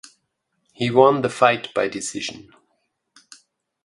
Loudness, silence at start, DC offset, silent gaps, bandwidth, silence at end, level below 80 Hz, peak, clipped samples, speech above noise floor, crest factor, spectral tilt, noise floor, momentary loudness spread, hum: -20 LUFS; 0.8 s; under 0.1%; none; 11.5 kHz; 1.45 s; -64 dBFS; 0 dBFS; under 0.1%; 54 dB; 22 dB; -4.5 dB/octave; -73 dBFS; 13 LU; none